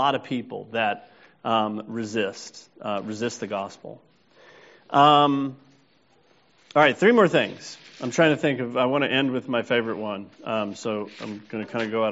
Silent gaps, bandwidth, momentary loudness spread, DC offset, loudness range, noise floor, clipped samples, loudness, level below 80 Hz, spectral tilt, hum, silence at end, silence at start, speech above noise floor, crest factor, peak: none; 8 kHz; 17 LU; under 0.1%; 8 LU; -61 dBFS; under 0.1%; -24 LUFS; -70 dBFS; -3 dB/octave; none; 0 s; 0 s; 38 dB; 22 dB; -2 dBFS